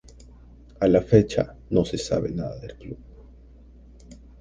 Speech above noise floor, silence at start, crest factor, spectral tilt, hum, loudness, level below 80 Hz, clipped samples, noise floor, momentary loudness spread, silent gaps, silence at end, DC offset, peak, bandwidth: 26 dB; 0.2 s; 22 dB; -7 dB/octave; none; -23 LUFS; -44 dBFS; under 0.1%; -48 dBFS; 22 LU; none; 0.25 s; under 0.1%; -2 dBFS; 9.8 kHz